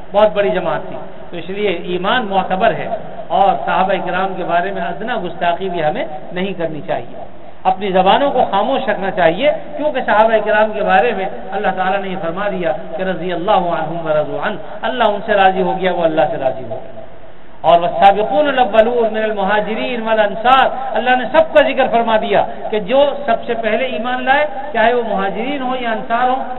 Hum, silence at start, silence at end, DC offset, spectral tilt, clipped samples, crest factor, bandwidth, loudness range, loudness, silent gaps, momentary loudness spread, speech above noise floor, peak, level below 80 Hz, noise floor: none; 0 s; 0 s; 5%; -7.5 dB/octave; under 0.1%; 16 dB; 4.2 kHz; 4 LU; -16 LUFS; none; 10 LU; 24 dB; 0 dBFS; -46 dBFS; -40 dBFS